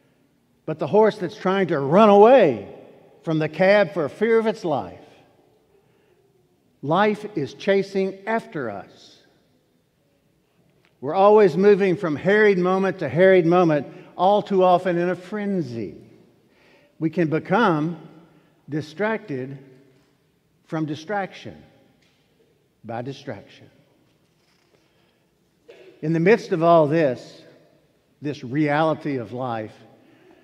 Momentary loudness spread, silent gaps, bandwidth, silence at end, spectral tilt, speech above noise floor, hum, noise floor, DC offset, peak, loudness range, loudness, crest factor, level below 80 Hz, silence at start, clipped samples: 18 LU; none; 9.6 kHz; 0.75 s; -7.5 dB/octave; 45 dB; none; -64 dBFS; under 0.1%; 0 dBFS; 16 LU; -20 LUFS; 22 dB; -70 dBFS; 0.7 s; under 0.1%